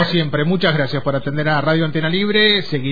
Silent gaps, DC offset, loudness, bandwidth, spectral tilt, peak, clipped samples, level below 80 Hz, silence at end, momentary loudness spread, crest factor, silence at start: none; 4%; -17 LUFS; 5 kHz; -7.5 dB/octave; -2 dBFS; under 0.1%; -48 dBFS; 0 s; 6 LU; 14 dB; 0 s